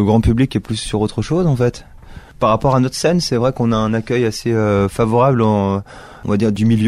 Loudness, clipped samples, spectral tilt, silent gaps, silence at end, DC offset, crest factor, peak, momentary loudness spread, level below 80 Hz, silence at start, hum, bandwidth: -16 LUFS; under 0.1%; -6.5 dB/octave; none; 0 s; under 0.1%; 12 dB; -2 dBFS; 6 LU; -34 dBFS; 0 s; none; 13 kHz